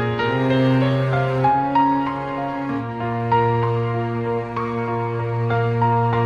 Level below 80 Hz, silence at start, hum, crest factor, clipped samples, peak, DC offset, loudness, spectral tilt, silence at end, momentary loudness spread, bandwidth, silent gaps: -50 dBFS; 0 s; none; 14 dB; under 0.1%; -6 dBFS; under 0.1%; -20 LUFS; -9 dB/octave; 0 s; 7 LU; 6.6 kHz; none